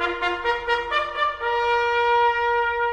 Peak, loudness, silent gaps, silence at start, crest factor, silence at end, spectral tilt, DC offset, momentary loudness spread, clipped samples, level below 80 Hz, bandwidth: -8 dBFS; -22 LUFS; none; 0 s; 14 dB; 0 s; -3.5 dB/octave; under 0.1%; 5 LU; under 0.1%; -48 dBFS; 9 kHz